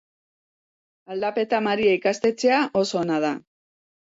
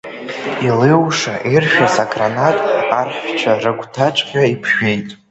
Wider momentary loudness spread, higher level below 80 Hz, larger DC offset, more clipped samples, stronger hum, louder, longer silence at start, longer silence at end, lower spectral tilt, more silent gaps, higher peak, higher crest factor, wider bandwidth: about the same, 8 LU vs 8 LU; second, -66 dBFS vs -54 dBFS; neither; neither; neither; second, -22 LUFS vs -15 LUFS; first, 1.1 s vs 0.05 s; first, 0.75 s vs 0.15 s; about the same, -4.5 dB/octave vs -5 dB/octave; neither; second, -8 dBFS vs 0 dBFS; about the same, 16 dB vs 16 dB; about the same, 8 kHz vs 8.2 kHz